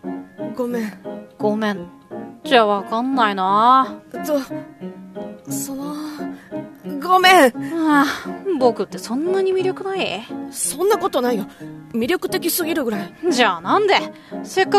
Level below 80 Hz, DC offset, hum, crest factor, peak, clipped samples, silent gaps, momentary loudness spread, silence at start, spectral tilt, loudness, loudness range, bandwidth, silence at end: -62 dBFS; under 0.1%; none; 20 dB; 0 dBFS; under 0.1%; none; 18 LU; 0.05 s; -3.5 dB/octave; -19 LUFS; 4 LU; 14.5 kHz; 0 s